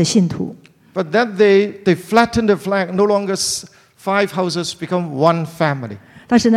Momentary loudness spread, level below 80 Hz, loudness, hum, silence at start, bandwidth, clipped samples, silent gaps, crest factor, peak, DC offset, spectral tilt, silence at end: 12 LU; -50 dBFS; -17 LUFS; none; 0 s; 15.5 kHz; under 0.1%; none; 16 dB; 0 dBFS; under 0.1%; -5 dB/octave; 0 s